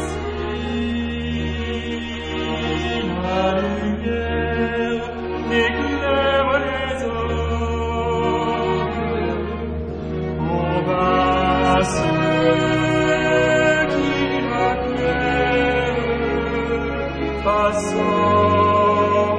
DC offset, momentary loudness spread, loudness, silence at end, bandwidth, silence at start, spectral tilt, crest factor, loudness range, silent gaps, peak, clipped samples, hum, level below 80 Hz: under 0.1%; 9 LU; -20 LUFS; 0 s; 10.5 kHz; 0 s; -6 dB/octave; 16 dB; 5 LU; none; -4 dBFS; under 0.1%; none; -34 dBFS